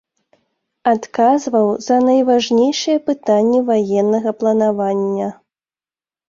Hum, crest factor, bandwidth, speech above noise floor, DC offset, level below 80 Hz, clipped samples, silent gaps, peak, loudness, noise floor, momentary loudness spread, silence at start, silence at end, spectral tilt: none; 14 dB; 7.6 kHz; over 75 dB; under 0.1%; -62 dBFS; under 0.1%; none; -2 dBFS; -16 LUFS; under -90 dBFS; 5 LU; 0.85 s; 0.95 s; -5.5 dB/octave